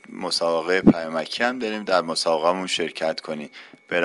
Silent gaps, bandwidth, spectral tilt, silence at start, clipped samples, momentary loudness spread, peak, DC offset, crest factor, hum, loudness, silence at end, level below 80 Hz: none; 11.5 kHz; -4.5 dB/octave; 0.1 s; under 0.1%; 11 LU; 0 dBFS; under 0.1%; 22 dB; none; -22 LUFS; 0 s; -56 dBFS